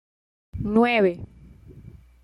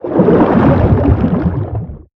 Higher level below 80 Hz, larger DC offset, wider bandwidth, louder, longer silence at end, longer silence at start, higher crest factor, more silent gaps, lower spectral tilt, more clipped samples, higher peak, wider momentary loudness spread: second, -48 dBFS vs -24 dBFS; neither; first, 11 kHz vs 5.6 kHz; second, -22 LUFS vs -11 LUFS; first, 0.35 s vs 0.15 s; first, 0.55 s vs 0.05 s; first, 18 dB vs 12 dB; neither; second, -8 dB/octave vs -11.5 dB/octave; neither; second, -8 dBFS vs 0 dBFS; first, 22 LU vs 11 LU